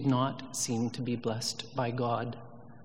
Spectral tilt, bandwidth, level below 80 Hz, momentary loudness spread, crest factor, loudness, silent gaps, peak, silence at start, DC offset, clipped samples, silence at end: -5 dB/octave; 16 kHz; -72 dBFS; 8 LU; 16 dB; -33 LUFS; none; -16 dBFS; 0 s; 0.3%; under 0.1%; 0 s